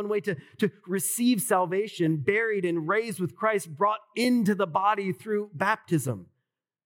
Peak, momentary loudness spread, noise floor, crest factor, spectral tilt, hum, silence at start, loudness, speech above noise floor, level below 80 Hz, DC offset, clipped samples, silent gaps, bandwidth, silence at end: -10 dBFS; 6 LU; -82 dBFS; 16 dB; -5 dB/octave; none; 0 s; -27 LUFS; 56 dB; -90 dBFS; under 0.1%; under 0.1%; none; 18 kHz; 0.6 s